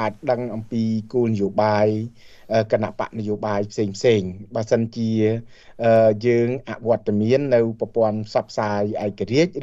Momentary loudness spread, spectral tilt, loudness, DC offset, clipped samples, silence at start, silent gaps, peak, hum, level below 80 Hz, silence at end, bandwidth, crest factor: 8 LU; -7 dB/octave; -21 LUFS; under 0.1%; under 0.1%; 0 s; none; -4 dBFS; none; -56 dBFS; 0 s; 7.8 kHz; 16 dB